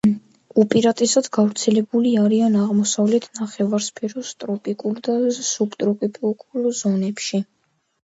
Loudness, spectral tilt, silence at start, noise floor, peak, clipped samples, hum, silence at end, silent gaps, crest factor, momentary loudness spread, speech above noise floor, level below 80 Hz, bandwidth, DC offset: -20 LUFS; -5 dB/octave; 0.05 s; -68 dBFS; -2 dBFS; under 0.1%; none; 0.65 s; none; 18 dB; 10 LU; 48 dB; -66 dBFS; 8 kHz; under 0.1%